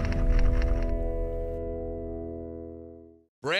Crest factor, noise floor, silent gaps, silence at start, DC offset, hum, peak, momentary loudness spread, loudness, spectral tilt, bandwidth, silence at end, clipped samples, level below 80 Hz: 14 dB; -48 dBFS; 3.28-3.42 s; 0 s; under 0.1%; none; -12 dBFS; 15 LU; -32 LUFS; -6.5 dB/octave; 8.2 kHz; 0 s; under 0.1%; -30 dBFS